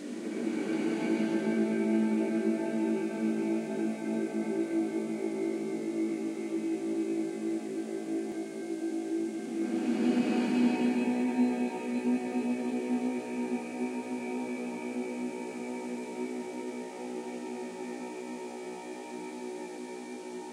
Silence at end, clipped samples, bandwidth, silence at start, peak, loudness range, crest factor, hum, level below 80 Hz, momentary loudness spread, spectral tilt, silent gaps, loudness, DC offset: 0 s; under 0.1%; 12 kHz; 0 s; -16 dBFS; 9 LU; 16 dB; none; under -90 dBFS; 12 LU; -6 dB/octave; none; -33 LUFS; under 0.1%